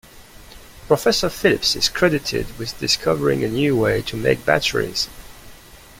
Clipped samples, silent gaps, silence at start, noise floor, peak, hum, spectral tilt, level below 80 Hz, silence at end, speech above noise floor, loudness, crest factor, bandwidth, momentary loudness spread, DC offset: under 0.1%; none; 0.15 s; -43 dBFS; -2 dBFS; none; -4 dB/octave; -42 dBFS; 0.25 s; 24 dB; -19 LUFS; 18 dB; 16.5 kHz; 8 LU; under 0.1%